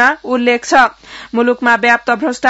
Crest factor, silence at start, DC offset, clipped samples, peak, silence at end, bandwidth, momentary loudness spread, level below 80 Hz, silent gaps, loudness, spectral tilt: 12 dB; 0 s; under 0.1%; 0.2%; 0 dBFS; 0 s; 8 kHz; 6 LU; -50 dBFS; none; -12 LUFS; -3 dB/octave